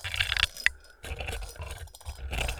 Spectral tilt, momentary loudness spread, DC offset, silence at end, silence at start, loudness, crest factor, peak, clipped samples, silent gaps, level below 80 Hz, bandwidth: -2 dB/octave; 17 LU; under 0.1%; 0 s; 0 s; -30 LUFS; 28 dB; -4 dBFS; under 0.1%; none; -40 dBFS; over 20 kHz